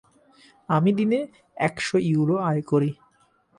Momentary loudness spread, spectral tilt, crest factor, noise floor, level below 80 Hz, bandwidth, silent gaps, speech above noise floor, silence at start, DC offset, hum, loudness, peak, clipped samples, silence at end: 7 LU; -7 dB/octave; 16 dB; -63 dBFS; -64 dBFS; 11 kHz; none; 40 dB; 0.7 s; under 0.1%; none; -23 LUFS; -8 dBFS; under 0.1%; 0.65 s